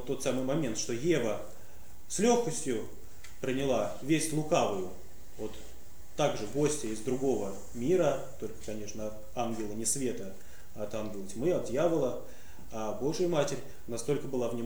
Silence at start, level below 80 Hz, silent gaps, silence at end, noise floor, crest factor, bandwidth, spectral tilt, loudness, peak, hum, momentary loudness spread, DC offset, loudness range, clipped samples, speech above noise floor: 0 s; -56 dBFS; none; 0 s; -54 dBFS; 20 dB; over 20 kHz; -4.5 dB/octave; -32 LUFS; -12 dBFS; none; 16 LU; 1%; 3 LU; under 0.1%; 22 dB